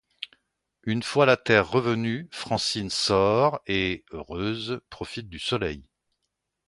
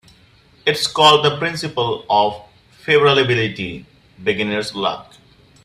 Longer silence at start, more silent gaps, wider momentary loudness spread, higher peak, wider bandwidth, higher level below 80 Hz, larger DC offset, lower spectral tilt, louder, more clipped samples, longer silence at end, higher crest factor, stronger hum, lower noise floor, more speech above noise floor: second, 0.2 s vs 0.65 s; neither; about the same, 16 LU vs 16 LU; second, -4 dBFS vs 0 dBFS; second, 11.5 kHz vs 14.5 kHz; about the same, -52 dBFS vs -54 dBFS; neither; about the same, -4.5 dB/octave vs -4 dB/octave; second, -25 LUFS vs -17 LUFS; neither; first, 0.85 s vs 0.65 s; about the same, 22 dB vs 18 dB; neither; first, -81 dBFS vs -51 dBFS; first, 56 dB vs 34 dB